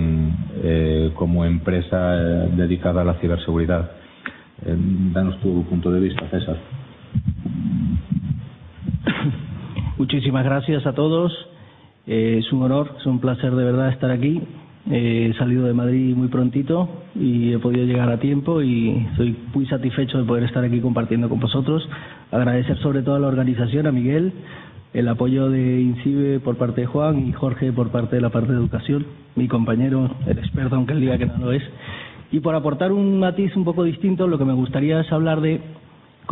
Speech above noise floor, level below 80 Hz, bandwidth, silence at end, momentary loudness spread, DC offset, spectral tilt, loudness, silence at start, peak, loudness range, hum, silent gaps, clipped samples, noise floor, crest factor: 28 dB; -38 dBFS; 4 kHz; 0 s; 9 LU; under 0.1%; -12.5 dB/octave; -21 LUFS; 0 s; -2 dBFS; 3 LU; none; none; under 0.1%; -47 dBFS; 18 dB